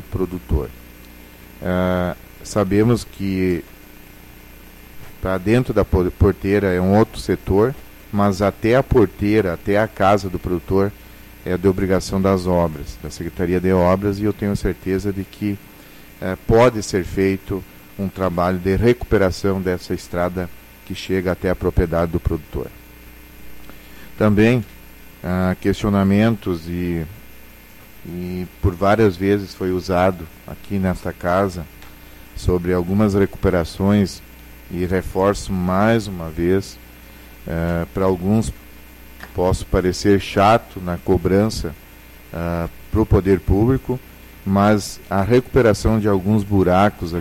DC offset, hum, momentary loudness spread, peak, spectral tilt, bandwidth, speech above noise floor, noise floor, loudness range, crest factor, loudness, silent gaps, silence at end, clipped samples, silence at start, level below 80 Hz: under 0.1%; none; 14 LU; -4 dBFS; -7 dB/octave; 16.5 kHz; 24 dB; -42 dBFS; 4 LU; 14 dB; -19 LUFS; none; 0 s; under 0.1%; 0 s; -34 dBFS